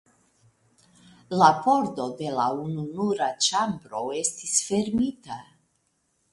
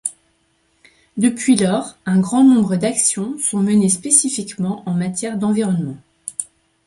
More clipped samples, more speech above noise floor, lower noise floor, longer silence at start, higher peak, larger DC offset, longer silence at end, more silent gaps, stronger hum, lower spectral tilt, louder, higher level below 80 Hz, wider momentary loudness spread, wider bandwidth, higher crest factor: neither; about the same, 47 dB vs 46 dB; first, -72 dBFS vs -62 dBFS; first, 1.3 s vs 0.05 s; second, -4 dBFS vs 0 dBFS; neither; first, 0.9 s vs 0.4 s; neither; neither; about the same, -3.5 dB/octave vs -4.5 dB/octave; second, -25 LUFS vs -17 LUFS; about the same, -62 dBFS vs -60 dBFS; about the same, 12 LU vs 14 LU; about the same, 11.5 kHz vs 11.5 kHz; first, 24 dB vs 18 dB